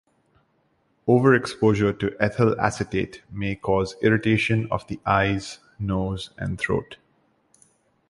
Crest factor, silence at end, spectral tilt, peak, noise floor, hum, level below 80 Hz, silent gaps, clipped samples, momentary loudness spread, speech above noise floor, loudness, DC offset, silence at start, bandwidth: 20 dB; 1.15 s; -6.5 dB/octave; -4 dBFS; -67 dBFS; none; -46 dBFS; none; under 0.1%; 11 LU; 44 dB; -23 LUFS; under 0.1%; 1.05 s; 11.5 kHz